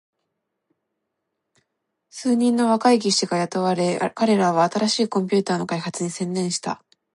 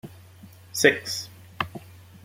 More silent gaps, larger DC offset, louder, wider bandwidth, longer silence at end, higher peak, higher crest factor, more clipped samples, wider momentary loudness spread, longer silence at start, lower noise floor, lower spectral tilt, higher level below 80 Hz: neither; neither; first, -21 LUFS vs -25 LUFS; second, 11.5 kHz vs 16.5 kHz; about the same, 0.4 s vs 0.3 s; second, -6 dBFS vs -2 dBFS; second, 18 dB vs 26 dB; neither; second, 9 LU vs 23 LU; first, 2.15 s vs 0.05 s; first, -79 dBFS vs -48 dBFS; first, -4.5 dB/octave vs -3 dB/octave; second, -72 dBFS vs -64 dBFS